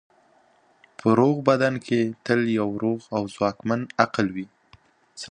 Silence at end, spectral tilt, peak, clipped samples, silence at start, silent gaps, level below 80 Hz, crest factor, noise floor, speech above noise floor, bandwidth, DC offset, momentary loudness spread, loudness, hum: 0 s; -6.5 dB/octave; -2 dBFS; under 0.1%; 1.05 s; none; -62 dBFS; 22 dB; -60 dBFS; 38 dB; 10 kHz; under 0.1%; 9 LU; -23 LUFS; none